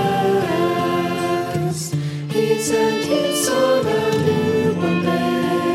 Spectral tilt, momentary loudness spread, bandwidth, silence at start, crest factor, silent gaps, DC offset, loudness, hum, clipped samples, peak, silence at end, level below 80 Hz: -5 dB/octave; 5 LU; 16.5 kHz; 0 s; 14 dB; none; under 0.1%; -19 LUFS; none; under 0.1%; -4 dBFS; 0 s; -64 dBFS